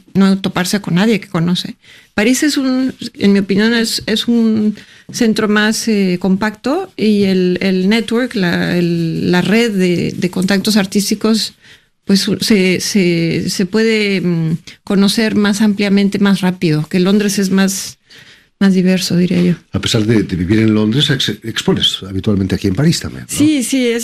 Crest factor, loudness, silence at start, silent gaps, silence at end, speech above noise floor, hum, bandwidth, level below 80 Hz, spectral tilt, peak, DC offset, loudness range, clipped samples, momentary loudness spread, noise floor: 12 dB; -14 LUFS; 0.15 s; none; 0 s; 29 dB; none; 15 kHz; -46 dBFS; -5 dB/octave; -2 dBFS; under 0.1%; 1 LU; under 0.1%; 5 LU; -42 dBFS